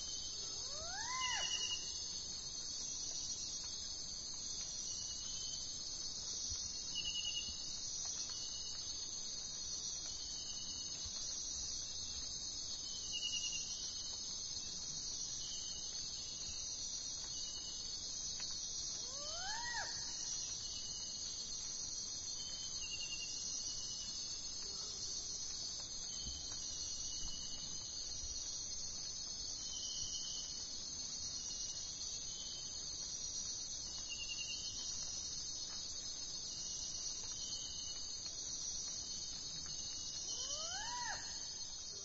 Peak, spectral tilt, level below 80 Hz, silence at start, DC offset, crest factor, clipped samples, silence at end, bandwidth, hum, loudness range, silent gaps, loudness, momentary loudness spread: -28 dBFS; 0 dB/octave; -62 dBFS; 0 s; under 0.1%; 16 dB; under 0.1%; 0 s; 7.6 kHz; none; 1 LU; none; -42 LUFS; 3 LU